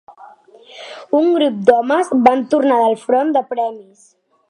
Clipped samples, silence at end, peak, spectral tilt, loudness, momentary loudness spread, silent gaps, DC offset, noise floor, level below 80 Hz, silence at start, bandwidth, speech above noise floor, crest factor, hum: under 0.1%; 0.7 s; 0 dBFS; -5.5 dB/octave; -15 LUFS; 11 LU; none; under 0.1%; -43 dBFS; -60 dBFS; 0.1 s; 11 kHz; 28 dB; 16 dB; none